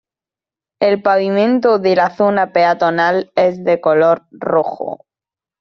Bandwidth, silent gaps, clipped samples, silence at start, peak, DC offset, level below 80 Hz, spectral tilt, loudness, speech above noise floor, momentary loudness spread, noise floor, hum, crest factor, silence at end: 6.4 kHz; none; under 0.1%; 0.8 s; -2 dBFS; under 0.1%; -62 dBFS; -4 dB/octave; -14 LUFS; 76 dB; 6 LU; -90 dBFS; none; 14 dB; 0.65 s